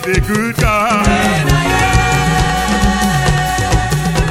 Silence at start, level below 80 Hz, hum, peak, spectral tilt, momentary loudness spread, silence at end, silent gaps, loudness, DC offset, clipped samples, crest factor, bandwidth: 0 s; -20 dBFS; none; 0 dBFS; -4.5 dB/octave; 3 LU; 0 s; none; -13 LUFS; under 0.1%; under 0.1%; 12 dB; 17 kHz